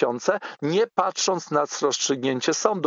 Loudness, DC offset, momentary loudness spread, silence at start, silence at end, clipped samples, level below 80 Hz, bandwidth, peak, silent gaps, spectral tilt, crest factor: -23 LUFS; under 0.1%; 3 LU; 0 s; 0 s; under 0.1%; -78 dBFS; 7.8 kHz; -4 dBFS; none; -3 dB/octave; 20 dB